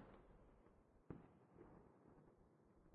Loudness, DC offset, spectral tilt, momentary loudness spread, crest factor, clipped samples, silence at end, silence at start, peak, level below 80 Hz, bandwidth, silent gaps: -65 LUFS; under 0.1%; -6.5 dB/octave; 7 LU; 28 dB; under 0.1%; 0 s; 0 s; -38 dBFS; -76 dBFS; 3.9 kHz; none